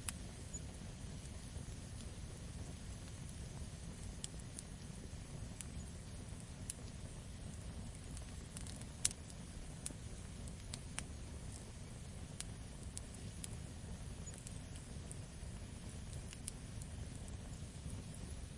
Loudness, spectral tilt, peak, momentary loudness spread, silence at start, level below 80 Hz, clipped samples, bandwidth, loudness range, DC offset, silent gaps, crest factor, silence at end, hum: -49 LUFS; -4 dB/octave; -12 dBFS; 3 LU; 0 s; -54 dBFS; under 0.1%; 11.5 kHz; 4 LU; under 0.1%; none; 36 dB; 0 s; none